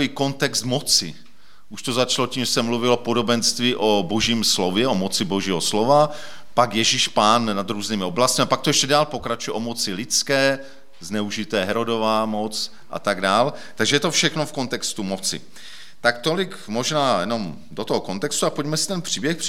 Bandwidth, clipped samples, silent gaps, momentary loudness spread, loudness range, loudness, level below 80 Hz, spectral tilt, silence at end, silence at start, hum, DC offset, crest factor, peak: 17 kHz; under 0.1%; none; 9 LU; 4 LU; -21 LUFS; -58 dBFS; -3 dB/octave; 0 s; 0 s; none; 2%; 20 dB; -2 dBFS